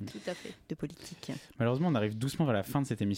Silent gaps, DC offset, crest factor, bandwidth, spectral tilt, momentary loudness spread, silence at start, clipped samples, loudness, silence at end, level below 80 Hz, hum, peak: none; under 0.1%; 14 dB; 16.5 kHz; -6.5 dB/octave; 13 LU; 0 s; under 0.1%; -34 LUFS; 0 s; -64 dBFS; none; -18 dBFS